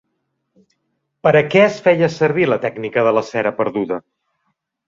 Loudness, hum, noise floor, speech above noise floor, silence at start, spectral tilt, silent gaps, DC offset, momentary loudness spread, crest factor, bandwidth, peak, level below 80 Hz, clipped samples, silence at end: -16 LUFS; none; -72 dBFS; 56 dB; 1.25 s; -6.5 dB/octave; none; under 0.1%; 8 LU; 16 dB; 7.6 kHz; -2 dBFS; -58 dBFS; under 0.1%; 0.85 s